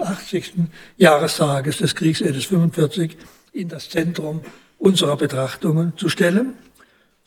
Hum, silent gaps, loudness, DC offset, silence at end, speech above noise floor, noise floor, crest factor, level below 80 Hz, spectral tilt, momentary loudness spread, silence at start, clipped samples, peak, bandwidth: none; none; -20 LUFS; under 0.1%; 0.7 s; 36 dB; -55 dBFS; 18 dB; -60 dBFS; -5.5 dB/octave; 12 LU; 0 s; under 0.1%; -2 dBFS; 17.5 kHz